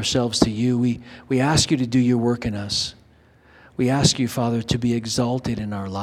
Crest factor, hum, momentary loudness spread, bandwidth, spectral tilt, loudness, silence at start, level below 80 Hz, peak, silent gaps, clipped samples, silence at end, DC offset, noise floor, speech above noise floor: 20 dB; none; 8 LU; 14.5 kHz; -5 dB/octave; -21 LUFS; 0 s; -46 dBFS; 0 dBFS; none; under 0.1%; 0 s; under 0.1%; -53 dBFS; 32 dB